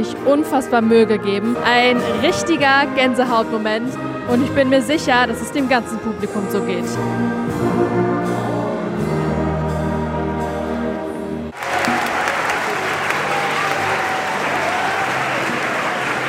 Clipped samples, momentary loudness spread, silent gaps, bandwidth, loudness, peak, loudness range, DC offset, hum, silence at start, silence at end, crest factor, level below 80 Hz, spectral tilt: under 0.1%; 8 LU; none; 16 kHz; -18 LUFS; 0 dBFS; 5 LU; under 0.1%; none; 0 s; 0 s; 18 dB; -42 dBFS; -5 dB/octave